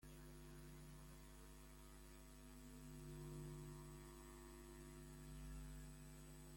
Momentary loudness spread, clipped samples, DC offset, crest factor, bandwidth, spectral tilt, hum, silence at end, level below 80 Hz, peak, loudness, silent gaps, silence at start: 7 LU; under 0.1%; under 0.1%; 12 dB; 16.5 kHz; -5 dB/octave; none; 0 s; -62 dBFS; -46 dBFS; -59 LUFS; none; 0 s